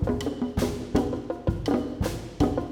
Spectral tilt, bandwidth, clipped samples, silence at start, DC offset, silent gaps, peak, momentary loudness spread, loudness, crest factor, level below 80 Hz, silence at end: -7 dB/octave; 19 kHz; under 0.1%; 0 s; under 0.1%; none; -10 dBFS; 4 LU; -28 LUFS; 18 dB; -38 dBFS; 0 s